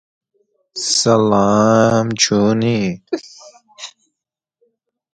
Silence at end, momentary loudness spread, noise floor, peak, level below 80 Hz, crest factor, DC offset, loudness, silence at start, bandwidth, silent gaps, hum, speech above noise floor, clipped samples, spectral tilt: 1.25 s; 21 LU; -83 dBFS; 0 dBFS; -52 dBFS; 18 dB; under 0.1%; -15 LUFS; 0.75 s; 9.4 kHz; none; none; 69 dB; under 0.1%; -4.5 dB/octave